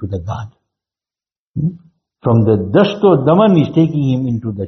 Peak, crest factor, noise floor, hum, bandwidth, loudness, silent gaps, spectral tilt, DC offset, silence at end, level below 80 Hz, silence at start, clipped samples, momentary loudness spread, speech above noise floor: 0 dBFS; 14 dB; under -90 dBFS; none; 6.4 kHz; -14 LUFS; 1.38-1.54 s; -7.5 dB/octave; under 0.1%; 0 s; -48 dBFS; 0 s; under 0.1%; 15 LU; over 77 dB